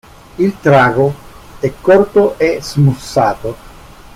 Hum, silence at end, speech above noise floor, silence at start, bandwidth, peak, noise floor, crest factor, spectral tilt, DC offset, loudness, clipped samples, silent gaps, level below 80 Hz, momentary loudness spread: none; 0.5 s; 24 dB; 0.4 s; 15.5 kHz; 0 dBFS; -36 dBFS; 12 dB; -7 dB/octave; under 0.1%; -13 LUFS; under 0.1%; none; -40 dBFS; 13 LU